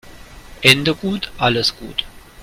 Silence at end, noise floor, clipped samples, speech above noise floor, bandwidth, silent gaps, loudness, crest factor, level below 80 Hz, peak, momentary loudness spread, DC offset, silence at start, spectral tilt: 0 s; -38 dBFS; under 0.1%; 21 dB; 16.5 kHz; none; -17 LUFS; 20 dB; -42 dBFS; 0 dBFS; 13 LU; under 0.1%; 0.05 s; -3.5 dB/octave